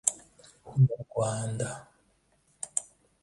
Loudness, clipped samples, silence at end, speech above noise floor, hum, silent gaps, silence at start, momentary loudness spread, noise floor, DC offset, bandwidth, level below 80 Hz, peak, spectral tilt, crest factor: -30 LUFS; under 0.1%; 0.4 s; 41 dB; none; none; 0.05 s; 16 LU; -69 dBFS; under 0.1%; 11.5 kHz; -62 dBFS; -6 dBFS; -5.5 dB/octave; 26 dB